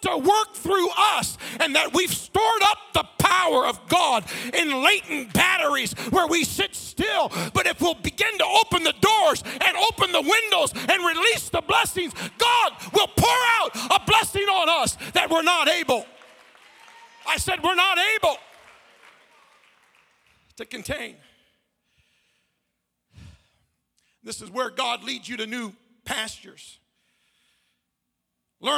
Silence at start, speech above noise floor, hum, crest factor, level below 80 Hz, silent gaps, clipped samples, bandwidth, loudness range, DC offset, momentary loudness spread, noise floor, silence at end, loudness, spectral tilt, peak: 0 s; 57 dB; none; 20 dB; -52 dBFS; none; under 0.1%; 17.5 kHz; 19 LU; under 0.1%; 12 LU; -79 dBFS; 0 s; -21 LUFS; -2.5 dB/octave; -4 dBFS